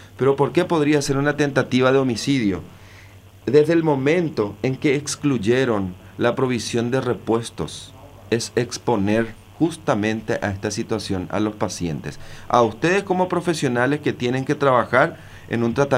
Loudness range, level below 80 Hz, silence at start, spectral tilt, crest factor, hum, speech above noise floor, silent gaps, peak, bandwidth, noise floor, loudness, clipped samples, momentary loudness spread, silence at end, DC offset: 4 LU; -50 dBFS; 0 s; -5.5 dB/octave; 20 dB; none; 24 dB; none; -2 dBFS; 15.5 kHz; -44 dBFS; -21 LUFS; under 0.1%; 9 LU; 0 s; under 0.1%